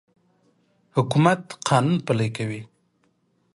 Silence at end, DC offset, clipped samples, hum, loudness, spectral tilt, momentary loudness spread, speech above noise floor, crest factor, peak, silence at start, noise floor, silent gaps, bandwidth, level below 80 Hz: 0.9 s; under 0.1%; under 0.1%; none; -23 LUFS; -6 dB/octave; 11 LU; 46 dB; 20 dB; -4 dBFS; 0.95 s; -67 dBFS; none; 11.5 kHz; -62 dBFS